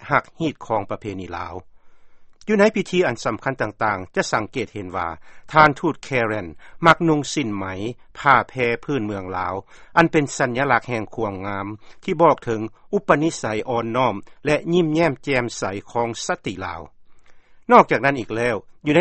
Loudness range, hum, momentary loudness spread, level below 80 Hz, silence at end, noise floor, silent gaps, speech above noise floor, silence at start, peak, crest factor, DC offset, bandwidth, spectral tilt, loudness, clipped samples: 3 LU; none; 14 LU; -50 dBFS; 0 s; -45 dBFS; none; 24 dB; 0 s; 0 dBFS; 22 dB; under 0.1%; 8.8 kHz; -5.5 dB/octave; -21 LUFS; under 0.1%